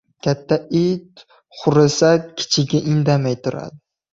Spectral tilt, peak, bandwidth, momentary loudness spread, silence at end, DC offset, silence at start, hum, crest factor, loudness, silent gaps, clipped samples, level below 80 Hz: -5.5 dB/octave; -2 dBFS; 7.8 kHz; 11 LU; 0.35 s; under 0.1%; 0.25 s; none; 16 dB; -18 LUFS; none; under 0.1%; -54 dBFS